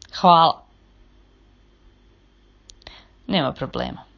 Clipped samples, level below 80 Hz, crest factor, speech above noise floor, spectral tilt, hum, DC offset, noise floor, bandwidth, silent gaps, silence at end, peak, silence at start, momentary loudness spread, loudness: under 0.1%; -50 dBFS; 24 dB; 37 dB; -6 dB/octave; 50 Hz at -60 dBFS; under 0.1%; -55 dBFS; 7.4 kHz; none; 0.15 s; 0 dBFS; 0.15 s; 23 LU; -19 LUFS